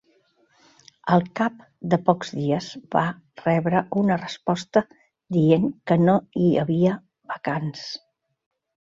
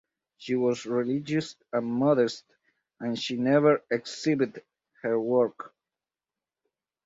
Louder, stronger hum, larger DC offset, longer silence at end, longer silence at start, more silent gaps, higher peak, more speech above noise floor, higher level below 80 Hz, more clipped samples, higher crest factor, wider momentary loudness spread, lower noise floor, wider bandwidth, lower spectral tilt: first, -23 LUFS vs -27 LUFS; neither; neither; second, 1 s vs 1.4 s; first, 1.05 s vs 0.4 s; neither; first, -2 dBFS vs -10 dBFS; second, 41 dB vs over 64 dB; first, -62 dBFS vs -72 dBFS; neither; about the same, 20 dB vs 20 dB; about the same, 14 LU vs 13 LU; second, -63 dBFS vs under -90 dBFS; about the same, 7.6 kHz vs 8 kHz; first, -7.5 dB/octave vs -6 dB/octave